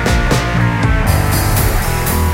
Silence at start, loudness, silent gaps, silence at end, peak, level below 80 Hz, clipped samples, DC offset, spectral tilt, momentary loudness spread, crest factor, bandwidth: 0 s; -14 LUFS; none; 0 s; 0 dBFS; -18 dBFS; under 0.1%; under 0.1%; -5 dB/octave; 2 LU; 12 dB; 17 kHz